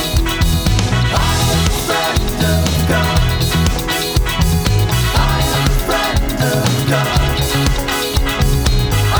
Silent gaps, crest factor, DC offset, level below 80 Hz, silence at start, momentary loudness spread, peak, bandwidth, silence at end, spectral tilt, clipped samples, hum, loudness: none; 14 dB; under 0.1%; -20 dBFS; 0 s; 2 LU; 0 dBFS; over 20 kHz; 0 s; -4.5 dB/octave; under 0.1%; none; -15 LUFS